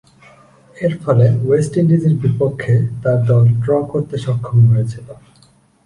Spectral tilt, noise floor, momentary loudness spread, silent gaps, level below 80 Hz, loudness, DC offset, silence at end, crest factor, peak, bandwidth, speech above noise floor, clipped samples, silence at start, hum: -9 dB/octave; -51 dBFS; 8 LU; none; -48 dBFS; -15 LUFS; under 0.1%; 0.7 s; 14 dB; -2 dBFS; 10.5 kHz; 37 dB; under 0.1%; 0.75 s; none